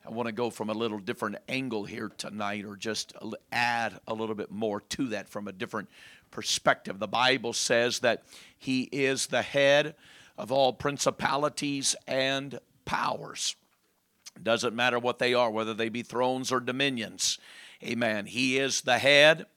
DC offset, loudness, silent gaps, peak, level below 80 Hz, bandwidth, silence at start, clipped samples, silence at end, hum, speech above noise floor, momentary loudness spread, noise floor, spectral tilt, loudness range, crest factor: under 0.1%; -28 LUFS; none; -6 dBFS; -68 dBFS; 16.5 kHz; 0.05 s; under 0.1%; 0.15 s; none; 42 dB; 12 LU; -71 dBFS; -3 dB/octave; 6 LU; 24 dB